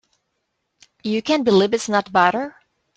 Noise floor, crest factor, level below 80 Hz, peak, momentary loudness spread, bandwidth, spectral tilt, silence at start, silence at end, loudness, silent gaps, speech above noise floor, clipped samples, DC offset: -74 dBFS; 20 dB; -62 dBFS; -2 dBFS; 12 LU; 9.2 kHz; -4.5 dB/octave; 1.05 s; 0.45 s; -19 LUFS; none; 56 dB; under 0.1%; under 0.1%